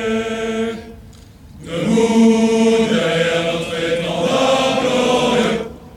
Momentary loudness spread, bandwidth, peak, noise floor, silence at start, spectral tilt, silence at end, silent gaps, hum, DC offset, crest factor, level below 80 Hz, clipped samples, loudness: 10 LU; 13 kHz; -4 dBFS; -40 dBFS; 0 s; -4.5 dB/octave; 0 s; none; none; under 0.1%; 14 dB; -44 dBFS; under 0.1%; -16 LUFS